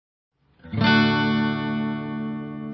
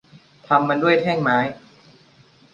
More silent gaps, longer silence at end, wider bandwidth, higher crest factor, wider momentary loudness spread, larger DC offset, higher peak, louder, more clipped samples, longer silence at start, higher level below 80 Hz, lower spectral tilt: neither; second, 0 s vs 1 s; second, 6 kHz vs 7.4 kHz; about the same, 18 dB vs 20 dB; first, 13 LU vs 4 LU; neither; second, -6 dBFS vs -2 dBFS; second, -23 LUFS vs -19 LUFS; neither; first, 0.65 s vs 0.5 s; first, -52 dBFS vs -62 dBFS; about the same, -7 dB/octave vs -7 dB/octave